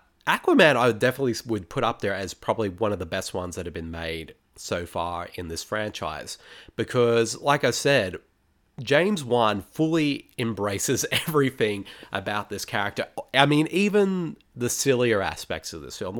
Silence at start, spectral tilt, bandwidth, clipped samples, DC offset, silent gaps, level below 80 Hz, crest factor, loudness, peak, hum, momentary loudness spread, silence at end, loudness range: 0.25 s; -4.5 dB/octave; 19 kHz; under 0.1%; under 0.1%; none; -54 dBFS; 24 dB; -25 LUFS; 0 dBFS; none; 13 LU; 0 s; 7 LU